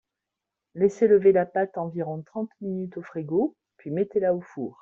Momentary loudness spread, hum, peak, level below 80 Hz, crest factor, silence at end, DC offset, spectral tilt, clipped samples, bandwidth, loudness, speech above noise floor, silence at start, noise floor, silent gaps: 16 LU; none; -8 dBFS; -68 dBFS; 18 dB; 0.1 s; under 0.1%; -9 dB/octave; under 0.1%; 7.4 kHz; -25 LUFS; 62 dB; 0.75 s; -86 dBFS; none